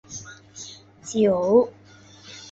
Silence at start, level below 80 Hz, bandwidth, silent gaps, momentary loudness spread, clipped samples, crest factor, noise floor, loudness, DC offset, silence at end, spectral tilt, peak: 0.1 s; -62 dBFS; 8 kHz; none; 22 LU; under 0.1%; 20 dB; -48 dBFS; -21 LUFS; under 0.1%; 0 s; -5.5 dB/octave; -4 dBFS